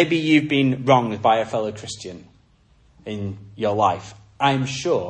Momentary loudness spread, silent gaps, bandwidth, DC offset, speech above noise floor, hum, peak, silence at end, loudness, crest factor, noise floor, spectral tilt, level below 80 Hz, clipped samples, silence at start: 16 LU; none; 9.6 kHz; under 0.1%; 36 dB; none; -2 dBFS; 0 s; -20 LUFS; 20 dB; -56 dBFS; -5.5 dB/octave; -58 dBFS; under 0.1%; 0 s